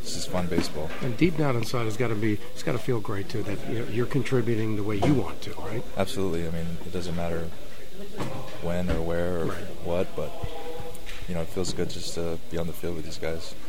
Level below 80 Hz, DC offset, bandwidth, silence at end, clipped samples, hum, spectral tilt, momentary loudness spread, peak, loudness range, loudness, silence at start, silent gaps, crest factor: -44 dBFS; 6%; 16.5 kHz; 0 s; under 0.1%; none; -6 dB/octave; 10 LU; -6 dBFS; 5 LU; -30 LUFS; 0 s; none; 22 dB